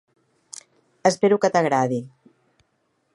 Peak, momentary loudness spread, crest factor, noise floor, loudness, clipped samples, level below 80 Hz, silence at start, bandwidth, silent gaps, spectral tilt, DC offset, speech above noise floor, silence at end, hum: -2 dBFS; 22 LU; 22 dB; -70 dBFS; -21 LUFS; under 0.1%; -74 dBFS; 1.05 s; 11.5 kHz; none; -5 dB/octave; under 0.1%; 50 dB; 1.1 s; none